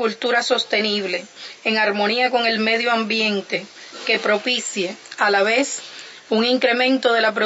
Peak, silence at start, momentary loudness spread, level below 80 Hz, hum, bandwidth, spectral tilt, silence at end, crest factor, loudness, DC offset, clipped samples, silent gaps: -4 dBFS; 0 s; 10 LU; -78 dBFS; none; 8 kHz; -2.5 dB/octave; 0 s; 16 dB; -19 LUFS; under 0.1%; under 0.1%; none